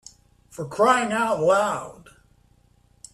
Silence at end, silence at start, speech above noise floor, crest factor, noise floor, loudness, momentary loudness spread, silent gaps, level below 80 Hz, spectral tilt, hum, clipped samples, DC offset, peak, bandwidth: 1.2 s; 0.6 s; 38 dB; 18 dB; -60 dBFS; -21 LUFS; 19 LU; none; -60 dBFS; -4 dB/octave; none; under 0.1%; under 0.1%; -6 dBFS; 13.5 kHz